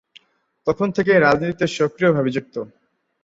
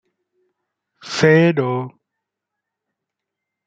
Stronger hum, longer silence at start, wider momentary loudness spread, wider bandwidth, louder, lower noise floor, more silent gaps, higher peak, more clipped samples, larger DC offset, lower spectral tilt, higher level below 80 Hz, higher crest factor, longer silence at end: neither; second, 0.65 s vs 1.05 s; about the same, 15 LU vs 14 LU; about the same, 8 kHz vs 8.6 kHz; second, -19 LUFS vs -16 LUFS; second, -61 dBFS vs -82 dBFS; neither; about the same, -2 dBFS vs -2 dBFS; neither; neither; about the same, -6.5 dB/octave vs -6 dB/octave; first, -56 dBFS vs -62 dBFS; about the same, 18 dB vs 20 dB; second, 0.55 s vs 1.8 s